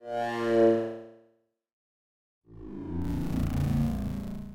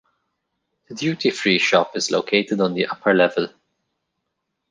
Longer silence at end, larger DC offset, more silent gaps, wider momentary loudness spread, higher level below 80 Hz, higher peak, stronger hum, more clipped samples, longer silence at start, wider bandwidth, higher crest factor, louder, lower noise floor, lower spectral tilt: second, 0 s vs 1.2 s; neither; first, 1.73-2.42 s vs none; first, 19 LU vs 9 LU; first, -42 dBFS vs -68 dBFS; second, -14 dBFS vs -2 dBFS; neither; neither; second, 0 s vs 0.9 s; first, 17 kHz vs 10 kHz; about the same, 16 dB vs 20 dB; second, -29 LUFS vs -19 LUFS; second, -69 dBFS vs -77 dBFS; first, -8 dB/octave vs -4 dB/octave